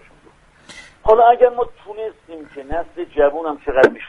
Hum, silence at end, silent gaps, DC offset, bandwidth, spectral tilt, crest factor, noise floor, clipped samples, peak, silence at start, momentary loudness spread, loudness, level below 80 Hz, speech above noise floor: none; 0 s; none; under 0.1%; 10.5 kHz; -5.5 dB/octave; 18 dB; -50 dBFS; under 0.1%; 0 dBFS; 0.7 s; 19 LU; -16 LUFS; -40 dBFS; 33 dB